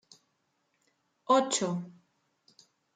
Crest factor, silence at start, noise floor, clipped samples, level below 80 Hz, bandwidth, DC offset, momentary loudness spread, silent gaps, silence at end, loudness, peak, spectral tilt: 22 dB; 1.3 s; -77 dBFS; under 0.1%; -82 dBFS; 9.6 kHz; under 0.1%; 23 LU; none; 1.05 s; -28 LUFS; -12 dBFS; -4 dB/octave